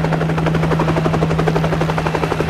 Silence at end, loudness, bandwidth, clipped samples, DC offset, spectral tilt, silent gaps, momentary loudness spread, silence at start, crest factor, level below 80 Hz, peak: 0 s; -17 LUFS; 11.5 kHz; under 0.1%; 0.2%; -7 dB/octave; none; 2 LU; 0 s; 16 dB; -32 dBFS; -2 dBFS